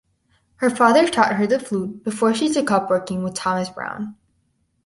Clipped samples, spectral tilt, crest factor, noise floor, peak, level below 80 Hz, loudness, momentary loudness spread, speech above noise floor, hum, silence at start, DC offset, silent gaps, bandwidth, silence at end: under 0.1%; -5 dB/octave; 18 dB; -67 dBFS; -2 dBFS; -60 dBFS; -20 LUFS; 13 LU; 48 dB; none; 0.6 s; under 0.1%; none; 11.5 kHz; 0.75 s